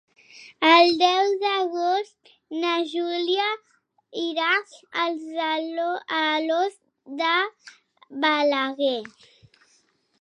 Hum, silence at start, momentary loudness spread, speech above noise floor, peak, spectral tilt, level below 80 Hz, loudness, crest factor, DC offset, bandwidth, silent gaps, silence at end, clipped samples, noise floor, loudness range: none; 0.35 s; 14 LU; 42 dB; -2 dBFS; -2 dB/octave; -78 dBFS; -23 LUFS; 22 dB; under 0.1%; 10.5 kHz; none; 1.15 s; under 0.1%; -65 dBFS; 5 LU